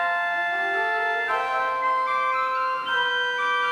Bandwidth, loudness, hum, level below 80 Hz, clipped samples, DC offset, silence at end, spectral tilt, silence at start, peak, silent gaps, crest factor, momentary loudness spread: 13.5 kHz; -23 LUFS; none; -70 dBFS; under 0.1%; under 0.1%; 0 s; -1.5 dB/octave; 0 s; -12 dBFS; none; 12 dB; 1 LU